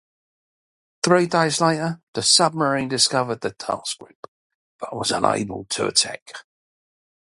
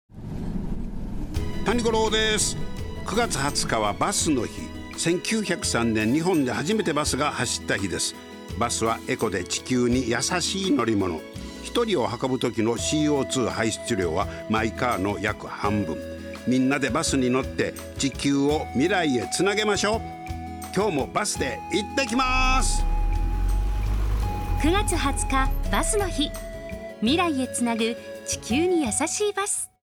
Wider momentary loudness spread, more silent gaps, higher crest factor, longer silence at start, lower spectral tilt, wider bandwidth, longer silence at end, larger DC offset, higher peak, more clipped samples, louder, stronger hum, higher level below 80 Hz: first, 17 LU vs 10 LU; first, 2.03-2.13 s, 4.15-4.79 s, 6.22-6.26 s vs none; first, 22 dB vs 16 dB; first, 1.05 s vs 0.1 s; about the same, -3 dB/octave vs -4 dB/octave; second, 11.5 kHz vs 19 kHz; first, 0.8 s vs 0.15 s; neither; first, 0 dBFS vs -8 dBFS; neither; first, -20 LUFS vs -25 LUFS; neither; second, -60 dBFS vs -32 dBFS